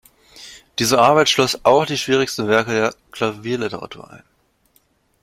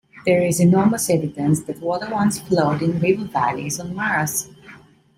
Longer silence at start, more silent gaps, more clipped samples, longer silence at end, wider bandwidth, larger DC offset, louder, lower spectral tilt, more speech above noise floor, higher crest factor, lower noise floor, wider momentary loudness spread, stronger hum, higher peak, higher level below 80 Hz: first, 0.35 s vs 0.15 s; neither; neither; first, 1.05 s vs 0.4 s; about the same, 16.5 kHz vs 16.5 kHz; neither; first, -17 LUFS vs -20 LUFS; second, -3.5 dB/octave vs -5.5 dB/octave; first, 43 dB vs 27 dB; about the same, 18 dB vs 16 dB; first, -61 dBFS vs -46 dBFS; first, 20 LU vs 9 LU; neither; first, 0 dBFS vs -4 dBFS; about the same, -56 dBFS vs -56 dBFS